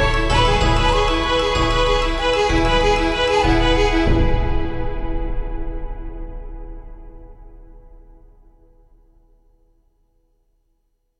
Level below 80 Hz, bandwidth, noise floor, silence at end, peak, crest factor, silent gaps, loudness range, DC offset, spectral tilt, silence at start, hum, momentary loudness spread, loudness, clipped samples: -24 dBFS; 11 kHz; -66 dBFS; 3.3 s; -2 dBFS; 16 dB; none; 19 LU; under 0.1%; -5 dB/octave; 0 s; none; 19 LU; -18 LUFS; under 0.1%